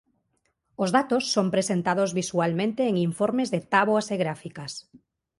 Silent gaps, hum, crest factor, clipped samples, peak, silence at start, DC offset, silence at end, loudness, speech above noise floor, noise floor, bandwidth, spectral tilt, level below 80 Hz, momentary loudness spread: none; none; 20 dB; under 0.1%; -6 dBFS; 0.8 s; under 0.1%; 0.4 s; -25 LUFS; 49 dB; -74 dBFS; 11.5 kHz; -5 dB/octave; -66 dBFS; 12 LU